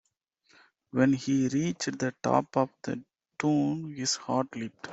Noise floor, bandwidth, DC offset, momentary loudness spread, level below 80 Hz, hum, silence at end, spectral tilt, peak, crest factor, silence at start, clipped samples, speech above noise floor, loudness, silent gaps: -70 dBFS; 8 kHz; under 0.1%; 10 LU; -68 dBFS; none; 0 s; -5 dB/octave; -8 dBFS; 20 dB; 0.95 s; under 0.1%; 42 dB; -29 LUFS; none